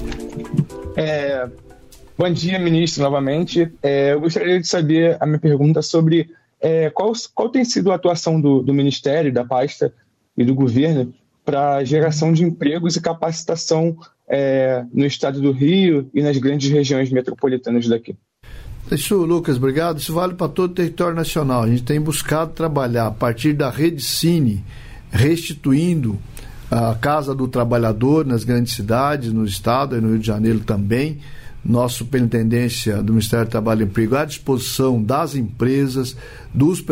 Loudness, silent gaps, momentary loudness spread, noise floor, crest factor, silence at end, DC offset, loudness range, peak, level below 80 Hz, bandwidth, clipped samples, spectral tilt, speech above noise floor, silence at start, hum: -18 LUFS; none; 7 LU; -43 dBFS; 14 dB; 0 s; under 0.1%; 3 LU; -4 dBFS; -42 dBFS; 16 kHz; under 0.1%; -6 dB/octave; 26 dB; 0 s; none